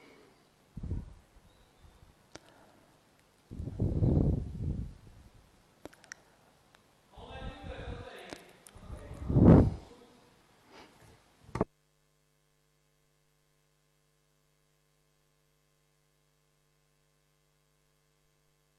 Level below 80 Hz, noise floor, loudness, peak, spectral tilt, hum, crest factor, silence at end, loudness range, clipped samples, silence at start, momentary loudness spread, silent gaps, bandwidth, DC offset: -44 dBFS; -73 dBFS; -29 LUFS; -8 dBFS; -9 dB/octave; none; 28 dB; 7.15 s; 19 LU; under 0.1%; 0.75 s; 29 LU; none; 12 kHz; under 0.1%